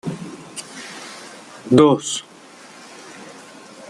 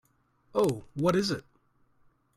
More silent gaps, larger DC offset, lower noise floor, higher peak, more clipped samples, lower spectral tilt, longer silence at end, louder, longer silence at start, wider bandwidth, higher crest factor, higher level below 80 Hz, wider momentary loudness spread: neither; neither; second, -43 dBFS vs -67 dBFS; first, -2 dBFS vs -14 dBFS; neither; about the same, -5 dB/octave vs -6 dB/octave; second, 0.6 s vs 0.95 s; first, -17 LUFS vs -29 LUFS; second, 0.05 s vs 0.55 s; second, 12.5 kHz vs 16 kHz; about the same, 20 dB vs 18 dB; about the same, -60 dBFS vs -62 dBFS; first, 27 LU vs 7 LU